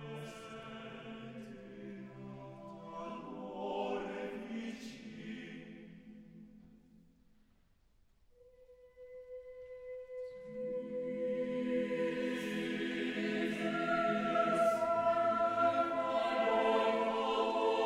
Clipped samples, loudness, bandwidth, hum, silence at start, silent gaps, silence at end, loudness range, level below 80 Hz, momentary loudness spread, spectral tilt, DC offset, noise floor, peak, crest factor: under 0.1%; -35 LUFS; 14 kHz; none; 0 s; none; 0 s; 20 LU; -70 dBFS; 19 LU; -5.5 dB/octave; under 0.1%; -69 dBFS; -18 dBFS; 18 dB